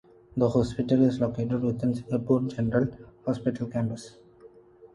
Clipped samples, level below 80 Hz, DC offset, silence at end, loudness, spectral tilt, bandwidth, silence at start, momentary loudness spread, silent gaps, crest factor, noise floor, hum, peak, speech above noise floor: under 0.1%; -52 dBFS; under 0.1%; 0.1 s; -27 LUFS; -8.5 dB/octave; 11 kHz; 0.35 s; 10 LU; none; 18 dB; -53 dBFS; none; -10 dBFS; 27 dB